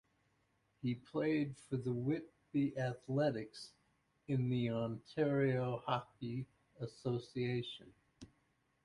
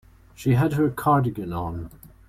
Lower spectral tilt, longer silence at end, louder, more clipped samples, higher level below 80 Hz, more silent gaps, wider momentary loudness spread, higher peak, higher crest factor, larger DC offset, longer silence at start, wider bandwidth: about the same, -7.5 dB/octave vs -8 dB/octave; first, 0.6 s vs 0.2 s; second, -39 LUFS vs -23 LUFS; neither; second, -72 dBFS vs -48 dBFS; neither; about the same, 13 LU vs 13 LU; second, -20 dBFS vs -8 dBFS; about the same, 20 dB vs 16 dB; neither; first, 0.85 s vs 0.4 s; second, 11.5 kHz vs 15.5 kHz